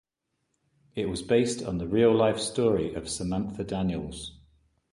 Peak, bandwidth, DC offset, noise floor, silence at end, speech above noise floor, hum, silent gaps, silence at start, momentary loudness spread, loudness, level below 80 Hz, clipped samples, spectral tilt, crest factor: -10 dBFS; 11.5 kHz; under 0.1%; -80 dBFS; 0.6 s; 53 dB; none; none; 0.95 s; 13 LU; -27 LUFS; -50 dBFS; under 0.1%; -5.5 dB/octave; 18 dB